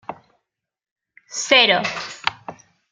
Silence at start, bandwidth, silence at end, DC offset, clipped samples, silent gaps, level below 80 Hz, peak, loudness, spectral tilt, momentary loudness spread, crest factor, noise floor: 0.1 s; 13 kHz; 0.4 s; under 0.1%; under 0.1%; 0.92-0.96 s; -68 dBFS; -2 dBFS; -17 LUFS; -1.5 dB/octave; 25 LU; 22 dB; -85 dBFS